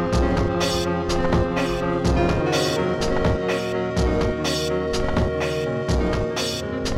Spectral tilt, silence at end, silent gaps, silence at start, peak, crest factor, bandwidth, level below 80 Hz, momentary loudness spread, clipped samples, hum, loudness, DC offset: -5.5 dB/octave; 0 s; none; 0 s; -6 dBFS; 14 dB; 16 kHz; -30 dBFS; 3 LU; under 0.1%; none; -22 LUFS; under 0.1%